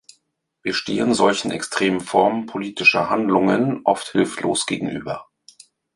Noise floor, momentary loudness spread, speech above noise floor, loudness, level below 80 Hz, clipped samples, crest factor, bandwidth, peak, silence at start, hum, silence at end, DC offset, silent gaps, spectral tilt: -69 dBFS; 11 LU; 50 dB; -20 LUFS; -58 dBFS; under 0.1%; 20 dB; 11.5 kHz; -2 dBFS; 0.65 s; none; 0.7 s; under 0.1%; none; -4 dB/octave